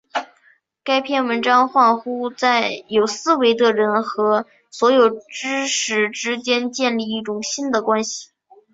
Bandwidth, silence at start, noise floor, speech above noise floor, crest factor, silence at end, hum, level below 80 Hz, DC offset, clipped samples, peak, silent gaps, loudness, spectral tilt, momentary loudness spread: 8 kHz; 0.15 s; -57 dBFS; 39 dB; 16 dB; 0.5 s; none; -68 dBFS; under 0.1%; under 0.1%; -2 dBFS; none; -19 LUFS; -2.5 dB/octave; 10 LU